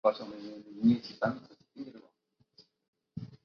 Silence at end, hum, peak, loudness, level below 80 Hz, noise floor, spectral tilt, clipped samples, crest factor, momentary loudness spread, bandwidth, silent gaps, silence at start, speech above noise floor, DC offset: 0.1 s; none; -12 dBFS; -32 LUFS; -70 dBFS; -74 dBFS; -6 dB/octave; under 0.1%; 22 dB; 20 LU; 6.2 kHz; 2.88-2.93 s; 0.05 s; 43 dB; under 0.1%